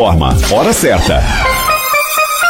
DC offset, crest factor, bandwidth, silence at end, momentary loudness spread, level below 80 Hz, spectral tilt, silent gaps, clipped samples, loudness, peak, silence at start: under 0.1%; 10 dB; 17 kHz; 0 s; 2 LU; -18 dBFS; -4 dB/octave; none; under 0.1%; -11 LUFS; -2 dBFS; 0 s